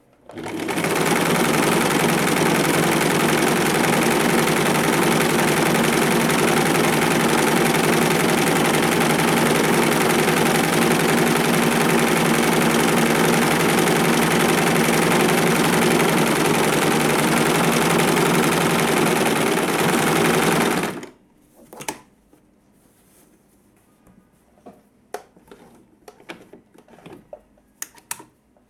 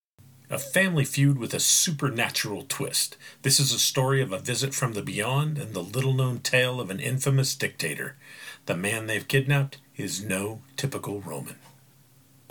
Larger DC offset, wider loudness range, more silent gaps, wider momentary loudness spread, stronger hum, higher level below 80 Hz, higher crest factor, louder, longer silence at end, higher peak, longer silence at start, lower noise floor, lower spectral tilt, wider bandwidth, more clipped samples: neither; about the same, 3 LU vs 5 LU; neither; second, 6 LU vs 13 LU; neither; first, -50 dBFS vs -68 dBFS; about the same, 14 dB vs 18 dB; first, -18 LUFS vs -25 LUFS; second, 0.5 s vs 0.8 s; first, -4 dBFS vs -8 dBFS; second, 0.3 s vs 0.5 s; about the same, -57 dBFS vs -58 dBFS; about the same, -4 dB/octave vs -3.5 dB/octave; about the same, 19.5 kHz vs 19 kHz; neither